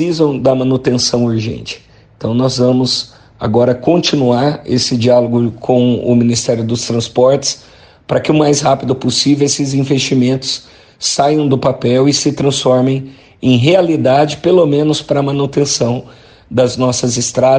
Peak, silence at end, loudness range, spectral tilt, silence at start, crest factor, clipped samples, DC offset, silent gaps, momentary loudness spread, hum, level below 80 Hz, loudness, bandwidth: 0 dBFS; 0 s; 2 LU; -5 dB/octave; 0 s; 12 dB; under 0.1%; under 0.1%; none; 8 LU; none; -46 dBFS; -13 LUFS; 9.8 kHz